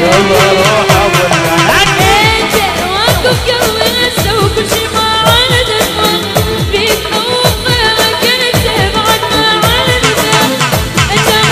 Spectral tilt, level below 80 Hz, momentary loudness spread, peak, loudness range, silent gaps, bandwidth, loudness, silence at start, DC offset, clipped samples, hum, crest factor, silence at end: -3.5 dB/octave; -26 dBFS; 4 LU; 0 dBFS; 2 LU; none; 16 kHz; -9 LUFS; 0 s; under 0.1%; 0.4%; none; 10 dB; 0 s